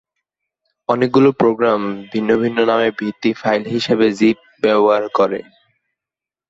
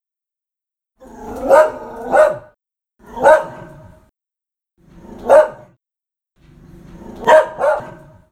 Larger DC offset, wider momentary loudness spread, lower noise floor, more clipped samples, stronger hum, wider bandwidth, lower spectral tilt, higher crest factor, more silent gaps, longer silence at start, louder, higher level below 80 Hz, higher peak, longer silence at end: neither; second, 7 LU vs 23 LU; first, -88 dBFS vs -84 dBFS; neither; neither; second, 7.8 kHz vs 14 kHz; first, -6.5 dB/octave vs -4.5 dB/octave; about the same, 16 dB vs 18 dB; neither; second, 0.9 s vs 1.2 s; about the same, -16 LUFS vs -14 LUFS; second, -58 dBFS vs -48 dBFS; about the same, -2 dBFS vs 0 dBFS; first, 1.1 s vs 0.4 s